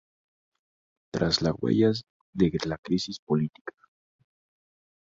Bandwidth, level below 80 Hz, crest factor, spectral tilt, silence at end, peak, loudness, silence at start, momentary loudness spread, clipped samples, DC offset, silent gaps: 7.8 kHz; -54 dBFS; 20 dB; -6 dB/octave; 1.35 s; -8 dBFS; -27 LUFS; 1.15 s; 14 LU; under 0.1%; under 0.1%; 2.10-2.33 s, 2.79-2.83 s, 3.19-3.27 s, 3.61-3.65 s